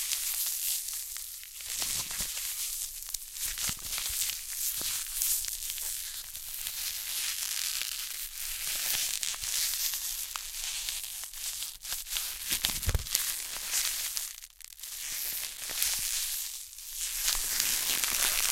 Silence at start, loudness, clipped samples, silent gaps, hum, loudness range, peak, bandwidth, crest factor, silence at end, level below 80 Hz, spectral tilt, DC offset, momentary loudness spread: 0 s; -31 LUFS; under 0.1%; none; none; 2 LU; -2 dBFS; 17 kHz; 32 dB; 0 s; -48 dBFS; 1 dB/octave; under 0.1%; 9 LU